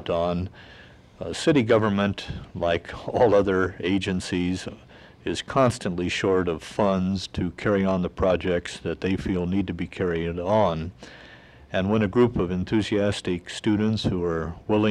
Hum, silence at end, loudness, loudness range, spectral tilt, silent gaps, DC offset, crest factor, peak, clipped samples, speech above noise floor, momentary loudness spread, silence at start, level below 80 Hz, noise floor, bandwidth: none; 0 s; -25 LUFS; 2 LU; -6.5 dB/octave; none; under 0.1%; 16 dB; -8 dBFS; under 0.1%; 24 dB; 10 LU; 0 s; -48 dBFS; -48 dBFS; 11.5 kHz